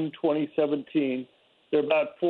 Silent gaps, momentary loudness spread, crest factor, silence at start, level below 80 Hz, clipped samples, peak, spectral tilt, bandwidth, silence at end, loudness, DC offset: none; 7 LU; 16 dB; 0 s; -78 dBFS; under 0.1%; -10 dBFS; -9 dB/octave; 4.4 kHz; 0 s; -27 LUFS; under 0.1%